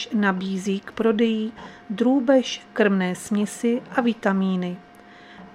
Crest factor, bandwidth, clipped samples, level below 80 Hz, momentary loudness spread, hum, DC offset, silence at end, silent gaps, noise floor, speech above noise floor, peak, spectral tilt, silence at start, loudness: 18 dB; 13 kHz; under 0.1%; -64 dBFS; 9 LU; none; under 0.1%; 0 s; none; -46 dBFS; 24 dB; -6 dBFS; -6 dB/octave; 0 s; -23 LUFS